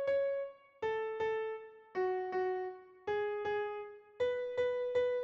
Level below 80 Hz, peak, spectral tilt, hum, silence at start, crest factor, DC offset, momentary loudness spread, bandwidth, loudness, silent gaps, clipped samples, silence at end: -74 dBFS; -24 dBFS; -5.5 dB/octave; none; 0 s; 14 dB; under 0.1%; 11 LU; 7.2 kHz; -37 LUFS; none; under 0.1%; 0 s